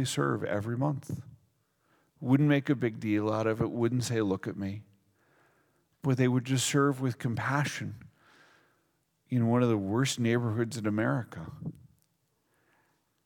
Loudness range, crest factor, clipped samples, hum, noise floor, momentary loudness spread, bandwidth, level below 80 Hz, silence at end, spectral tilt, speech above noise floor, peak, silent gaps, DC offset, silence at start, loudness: 3 LU; 20 dB; under 0.1%; none; -75 dBFS; 15 LU; 18.5 kHz; -68 dBFS; 1.55 s; -6 dB/octave; 46 dB; -12 dBFS; none; under 0.1%; 0 s; -30 LUFS